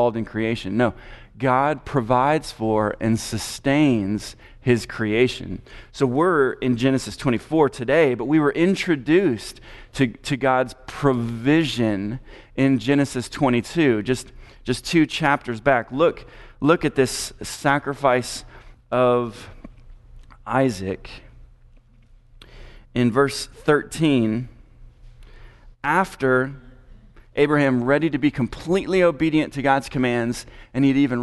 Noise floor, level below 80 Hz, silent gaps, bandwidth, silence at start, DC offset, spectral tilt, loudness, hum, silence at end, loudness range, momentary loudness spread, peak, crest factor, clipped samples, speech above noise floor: -51 dBFS; -46 dBFS; none; 12 kHz; 0 s; under 0.1%; -6 dB/octave; -21 LUFS; none; 0 s; 5 LU; 12 LU; -2 dBFS; 20 dB; under 0.1%; 31 dB